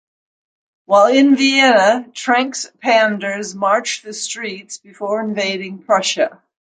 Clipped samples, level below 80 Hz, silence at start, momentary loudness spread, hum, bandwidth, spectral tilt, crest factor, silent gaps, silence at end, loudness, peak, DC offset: under 0.1%; -70 dBFS; 0.9 s; 14 LU; none; 9.6 kHz; -3 dB/octave; 16 dB; none; 0.35 s; -16 LUFS; -2 dBFS; under 0.1%